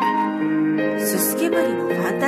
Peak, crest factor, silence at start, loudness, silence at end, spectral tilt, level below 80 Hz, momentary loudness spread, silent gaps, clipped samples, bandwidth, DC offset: -4 dBFS; 16 dB; 0 s; -20 LUFS; 0 s; -4.5 dB/octave; -68 dBFS; 2 LU; none; under 0.1%; 14.5 kHz; under 0.1%